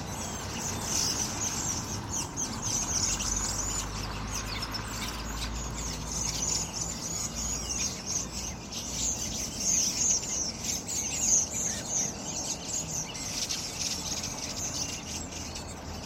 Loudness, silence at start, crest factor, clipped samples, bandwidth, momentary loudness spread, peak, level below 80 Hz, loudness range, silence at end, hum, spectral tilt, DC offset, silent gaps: -30 LUFS; 0 s; 20 dB; under 0.1%; 16 kHz; 10 LU; -12 dBFS; -44 dBFS; 5 LU; 0 s; none; -1.5 dB/octave; under 0.1%; none